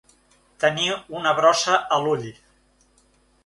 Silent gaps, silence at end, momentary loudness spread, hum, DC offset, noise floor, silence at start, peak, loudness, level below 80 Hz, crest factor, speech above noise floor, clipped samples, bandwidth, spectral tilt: none; 1.15 s; 8 LU; none; under 0.1%; -61 dBFS; 0.6 s; -4 dBFS; -21 LUFS; -64 dBFS; 20 dB; 40 dB; under 0.1%; 11.5 kHz; -3 dB/octave